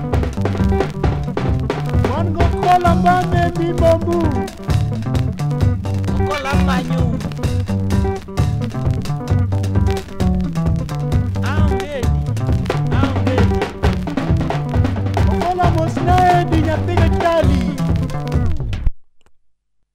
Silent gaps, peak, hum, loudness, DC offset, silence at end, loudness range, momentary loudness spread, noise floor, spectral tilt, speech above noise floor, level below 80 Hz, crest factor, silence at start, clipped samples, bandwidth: none; 0 dBFS; none; -18 LUFS; under 0.1%; 0.75 s; 3 LU; 6 LU; -57 dBFS; -7.5 dB/octave; 42 dB; -24 dBFS; 16 dB; 0 s; under 0.1%; 14 kHz